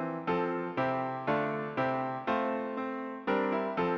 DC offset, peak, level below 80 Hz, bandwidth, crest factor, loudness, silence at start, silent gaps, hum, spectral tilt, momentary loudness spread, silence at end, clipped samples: under 0.1%; -18 dBFS; -68 dBFS; 7 kHz; 14 dB; -32 LUFS; 0 s; none; none; -8 dB/octave; 4 LU; 0 s; under 0.1%